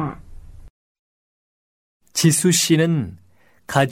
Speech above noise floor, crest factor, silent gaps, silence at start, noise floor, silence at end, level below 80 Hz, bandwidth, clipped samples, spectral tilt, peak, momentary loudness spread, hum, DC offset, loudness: 22 dB; 20 dB; 0.70-2.00 s; 0 s; -39 dBFS; 0 s; -48 dBFS; 16.5 kHz; under 0.1%; -4 dB/octave; -2 dBFS; 13 LU; none; 0.2%; -18 LUFS